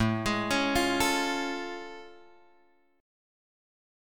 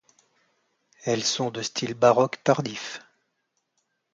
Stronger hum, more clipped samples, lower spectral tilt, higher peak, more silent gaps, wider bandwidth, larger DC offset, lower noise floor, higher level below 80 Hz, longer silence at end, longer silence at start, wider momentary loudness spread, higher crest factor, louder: neither; neither; about the same, -4 dB/octave vs -4 dB/octave; second, -12 dBFS vs -6 dBFS; neither; first, 17.5 kHz vs 9.4 kHz; neither; second, -66 dBFS vs -76 dBFS; first, -52 dBFS vs -70 dBFS; second, 1 s vs 1.15 s; second, 0 s vs 1.05 s; about the same, 16 LU vs 15 LU; about the same, 20 dB vs 22 dB; second, -28 LUFS vs -24 LUFS